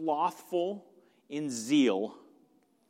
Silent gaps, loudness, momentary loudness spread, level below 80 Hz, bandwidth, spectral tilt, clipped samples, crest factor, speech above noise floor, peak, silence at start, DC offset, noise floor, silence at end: none; -31 LUFS; 14 LU; -84 dBFS; 16 kHz; -4.5 dB/octave; under 0.1%; 18 dB; 37 dB; -14 dBFS; 0 s; under 0.1%; -67 dBFS; 0.7 s